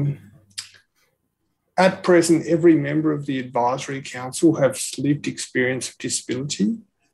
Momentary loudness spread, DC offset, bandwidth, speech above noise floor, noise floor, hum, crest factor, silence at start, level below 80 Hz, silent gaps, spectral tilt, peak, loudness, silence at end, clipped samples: 14 LU; under 0.1%; 12.5 kHz; 53 dB; -73 dBFS; none; 18 dB; 0 s; -68 dBFS; none; -5 dB/octave; -4 dBFS; -21 LUFS; 0.3 s; under 0.1%